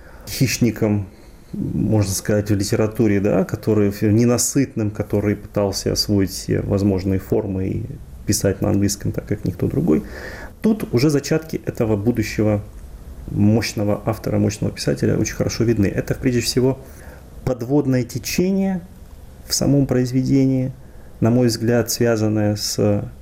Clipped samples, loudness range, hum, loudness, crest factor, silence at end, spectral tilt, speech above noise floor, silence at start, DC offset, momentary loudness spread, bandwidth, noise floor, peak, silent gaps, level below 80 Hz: under 0.1%; 3 LU; none; -20 LUFS; 12 dB; 0 s; -5.5 dB/octave; 20 dB; 0 s; under 0.1%; 10 LU; 16 kHz; -39 dBFS; -6 dBFS; none; -40 dBFS